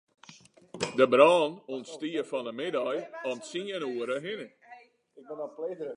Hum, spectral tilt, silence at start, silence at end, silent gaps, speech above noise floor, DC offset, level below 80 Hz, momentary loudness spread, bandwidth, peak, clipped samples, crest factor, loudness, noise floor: none; -4.5 dB/octave; 0.3 s; 0 s; none; 28 dB; under 0.1%; -76 dBFS; 19 LU; 11 kHz; -6 dBFS; under 0.1%; 24 dB; -29 LUFS; -56 dBFS